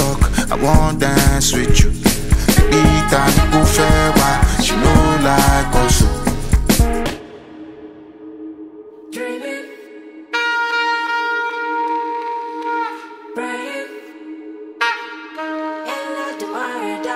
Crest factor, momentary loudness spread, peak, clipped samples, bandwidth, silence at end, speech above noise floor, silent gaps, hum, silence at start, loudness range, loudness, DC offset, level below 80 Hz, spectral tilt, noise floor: 16 dB; 21 LU; 0 dBFS; under 0.1%; 16 kHz; 0 s; 25 dB; none; none; 0 s; 11 LU; -16 LUFS; under 0.1%; -20 dBFS; -4.5 dB/octave; -37 dBFS